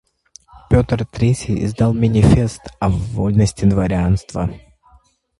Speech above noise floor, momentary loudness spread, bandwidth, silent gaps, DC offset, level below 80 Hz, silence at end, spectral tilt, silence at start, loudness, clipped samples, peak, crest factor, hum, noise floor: 37 dB; 9 LU; 11.5 kHz; none; under 0.1%; -30 dBFS; 0.8 s; -7.5 dB/octave; 0.55 s; -17 LUFS; under 0.1%; 0 dBFS; 16 dB; none; -53 dBFS